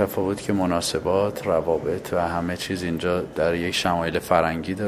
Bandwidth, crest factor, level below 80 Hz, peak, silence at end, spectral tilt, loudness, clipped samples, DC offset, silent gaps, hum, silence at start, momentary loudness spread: 16 kHz; 20 dB; -44 dBFS; -4 dBFS; 0 s; -5 dB/octave; -24 LUFS; under 0.1%; under 0.1%; none; none; 0 s; 4 LU